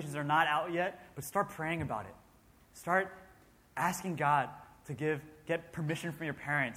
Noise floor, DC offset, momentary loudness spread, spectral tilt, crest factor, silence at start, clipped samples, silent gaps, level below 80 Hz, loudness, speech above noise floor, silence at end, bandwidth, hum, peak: -63 dBFS; under 0.1%; 13 LU; -5 dB/octave; 22 dB; 0 s; under 0.1%; none; -66 dBFS; -34 LUFS; 29 dB; 0 s; 16.5 kHz; none; -14 dBFS